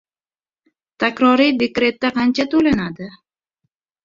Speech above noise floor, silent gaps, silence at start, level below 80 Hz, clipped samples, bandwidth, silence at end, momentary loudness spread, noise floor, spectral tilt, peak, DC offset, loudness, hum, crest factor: over 73 dB; none; 1 s; -52 dBFS; under 0.1%; 7.4 kHz; 0.95 s; 12 LU; under -90 dBFS; -5.5 dB/octave; -2 dBFS; under 0.1%; -17 LUFS; none; 18 dB